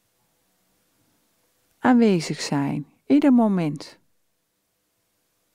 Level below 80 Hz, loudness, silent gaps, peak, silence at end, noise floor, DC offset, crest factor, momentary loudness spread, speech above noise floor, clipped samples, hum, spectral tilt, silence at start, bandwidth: -70 dBFS; -21 LUFS; none; -8 dBFS; 1.65 s; -73 dBFS; under 0.1%; 16 dB; 14 LU; 53 dB; under 0.1%; none; -6.5 dB/octave; 1.85 s; 11.5 kHz